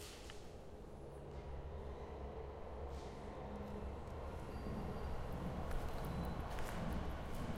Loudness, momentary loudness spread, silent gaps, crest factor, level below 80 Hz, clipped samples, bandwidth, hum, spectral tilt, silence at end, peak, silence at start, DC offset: -48 LUFS; 9 LU; none; 16 dB; -50 dBFS; under 0.1%; 16 kHz; none; -6.5 dB/octave; 0 s; -30 dBFS; 0 s; under 0.1%